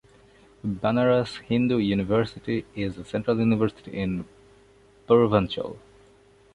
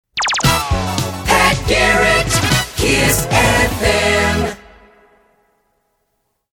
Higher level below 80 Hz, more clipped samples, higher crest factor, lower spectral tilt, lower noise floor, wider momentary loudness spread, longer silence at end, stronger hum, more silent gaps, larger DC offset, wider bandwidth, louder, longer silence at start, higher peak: second, -52 dBFS vs -28 dBFS; neither; about the same, 20 dB vs 16 dB; first, -8 dB/octave vs -3.5 dB/octave; second, -56 dBFS vs -68 dBFS; first, 12 LU vs 7 LU; second, 0.75 s vs 2 s; neither; neither; neither; second, 10.5 kHz vs 19 kHz; second, -25 LUFS vs -14 LUFS; first, 0.65 s vs 0.15 s; second, -4 dBFS vs 0 dBFS